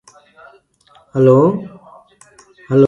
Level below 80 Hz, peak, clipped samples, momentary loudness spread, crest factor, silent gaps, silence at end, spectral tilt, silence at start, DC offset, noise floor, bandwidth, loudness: -60 dBFS; 0 dBFS; under 0.1%; 17 LU; 16 dB; none; 0 s; -9.5 dB/octave; 1.15 s; under 0.1%; -52 dBFS; 9.6 kHz; -14 LUFS